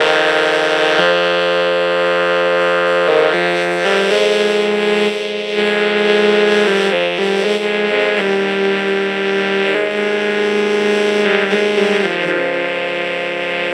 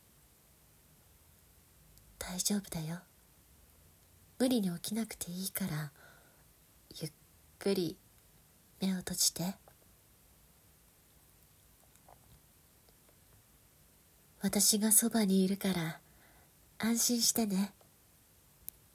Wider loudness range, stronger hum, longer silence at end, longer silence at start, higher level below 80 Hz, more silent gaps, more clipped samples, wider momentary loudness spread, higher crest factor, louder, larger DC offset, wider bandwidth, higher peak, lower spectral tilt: second, 2 LU vs 11 LU; neither; second, 0 s vs 1.25 s; second, 0 s vs 2.2 s; about the same, -70 dBFS vs -66 dBFS; neither; neither; second, 4 LU vs 19 LU; second, 14 dB vs 26 dB; first, -14 LUFS vs -32 LUFS; neither; second, 12 kHz vs 16 kHz; first, 0 dBFS vs -12 dBFS; about the same, -4 dB/octave vs -3.5 dB/octave